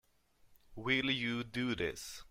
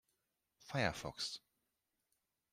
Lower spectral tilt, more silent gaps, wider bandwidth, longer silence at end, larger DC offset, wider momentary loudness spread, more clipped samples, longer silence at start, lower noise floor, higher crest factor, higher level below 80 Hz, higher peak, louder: about the same, -4 dB/octave vs -4 dB/octave; neither; about the same, 16 kHz vs 16 kHz; second, 0 s vs 1.15 s; neither; first, 10 LU vs 7 LU; neither; second, 0.45 s vs 0.6 s; second, -69 dBFS vs -87 dBFS; second, 20 dB vs 26 dB; first, -62 dBFS vs -70 dBFS; about the same, -18 dBFS vs -20 dBFS; first, -35 LUFS vs -41 LUFS